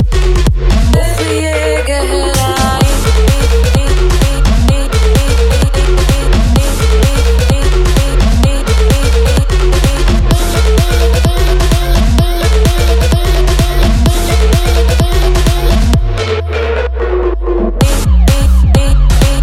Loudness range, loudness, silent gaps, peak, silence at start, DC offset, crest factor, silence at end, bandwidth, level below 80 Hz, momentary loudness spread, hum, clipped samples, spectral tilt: 1 LU; -11 LUFS; none; 0 dBFS; 0 s; under 0.1%; 8 dB; 0 s; 15.5 kHz; -10 dBFS; 3 LU; none; under 0.1%; -5.5 dB/octave